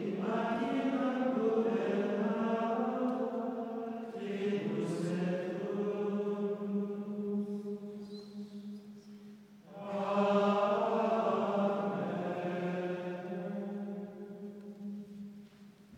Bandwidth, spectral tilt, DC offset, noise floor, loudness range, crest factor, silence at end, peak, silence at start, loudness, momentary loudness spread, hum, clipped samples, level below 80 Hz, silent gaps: 10.5 kHz; -7.5 dB/octave; under 0.1%; -56 dBFS; 8 LU; 18 dB; 0 s; -18 dBFS; 0 s; -34 LUFS; 16 LU; none; under 0.1%; -82 dBFS; none